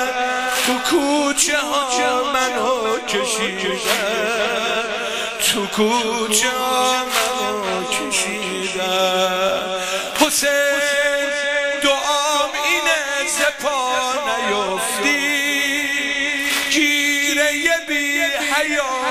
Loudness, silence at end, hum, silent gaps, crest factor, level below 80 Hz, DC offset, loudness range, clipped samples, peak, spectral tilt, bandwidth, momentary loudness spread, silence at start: -18 LUFS; 0 s; none; none; 18 dB; -54 dBFS; under 0.1%; 2 LU; under 0.1%; 0 dBFS; -1 dB/octave; 15.5 kHz; 5 LU; 0 s